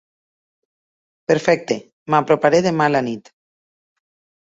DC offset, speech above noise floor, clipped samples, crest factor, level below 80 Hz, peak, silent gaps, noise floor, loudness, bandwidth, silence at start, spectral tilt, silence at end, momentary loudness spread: under 0.1%; over 73 dB; under 0.1%; 20 dB; -62 dBFS; -2 dBFS; 1.93-2.06 s; under -90 dBFS; -18 LUFS; 8 kHz; 1.3 s; -5.5 dB/octave; 1.25 s; 12 LU